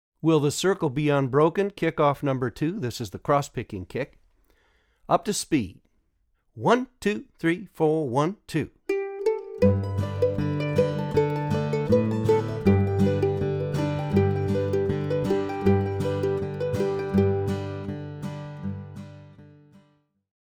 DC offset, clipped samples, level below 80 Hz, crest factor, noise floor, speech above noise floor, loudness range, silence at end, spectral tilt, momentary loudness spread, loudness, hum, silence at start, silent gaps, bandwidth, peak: under 0.1%; under 0.1%; -54 dBFS; 18 dB; -69 dBFS; 45 dB; 5 LU; 1 s; -6.5 dB/octave; 11 LU; -25 LUFS; none; 0.25 s; none; 16 kHz; -6 dBFS